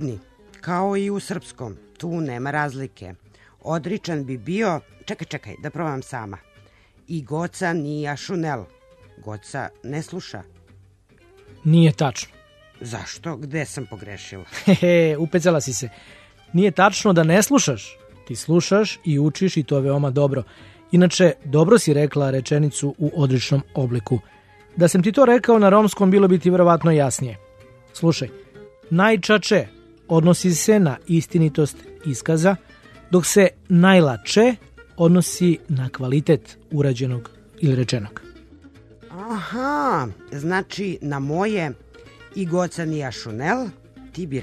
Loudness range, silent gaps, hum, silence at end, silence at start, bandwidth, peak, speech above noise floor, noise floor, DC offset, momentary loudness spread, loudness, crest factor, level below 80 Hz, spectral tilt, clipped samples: 11 LU; none; none; 0 s; 0 s; 13.5 kHz; 0 dBFS; 34 dB; -53 dBFS; under 0.1%; 18 LU; -20 LUFS; 20 dB; -54 dBFS; -6 dB/octave; under 0.1%